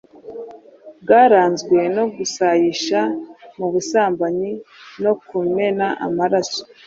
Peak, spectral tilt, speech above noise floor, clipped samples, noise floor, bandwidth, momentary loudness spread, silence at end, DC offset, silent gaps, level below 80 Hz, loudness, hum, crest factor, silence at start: -2 dBFS; -4.5 dB/octave; 25 dB; under 0.1%; -42 dBFS; 7.8 kHz; 21 LU; 0.2 s; under 0.1%; none; -64 dBFS; -18 LUFS; none; 18 dB; 0.25 s